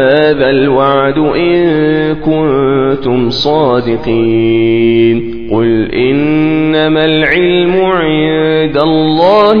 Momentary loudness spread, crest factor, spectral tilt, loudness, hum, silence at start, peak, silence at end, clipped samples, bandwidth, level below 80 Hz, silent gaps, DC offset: 3 LU; 10 dB; -8 dB/octave; -10 LUFS; none; 0 s; 0 dBFS; 0 s; 0.2%; 5.4 kHz; -36 dBFS; none; 3%